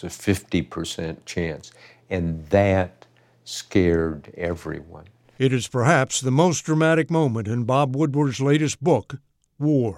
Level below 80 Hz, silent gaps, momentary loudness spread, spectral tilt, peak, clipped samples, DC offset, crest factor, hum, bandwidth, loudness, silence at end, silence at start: -48 dBFS; none; 12 LU; -5.5 dB/octave; -4 dBFS; under 0.1%; under 0.1%; 18 dB; none; 16 kHz; -22 LUFS; 0 s; 0 s